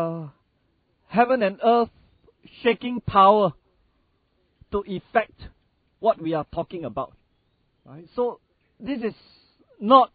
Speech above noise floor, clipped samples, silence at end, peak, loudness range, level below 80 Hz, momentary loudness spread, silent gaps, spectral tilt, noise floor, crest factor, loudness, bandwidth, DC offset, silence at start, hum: 46 dB; under 0.1%; 0.1 s; -2 dBFS; 10 LU; -54 dBFS; 16 LU; none; -10 dB/octave; -68 dBFS; 22 dB; -23 LUFS; 4.9 kHz; under 0.1%; 0 s; none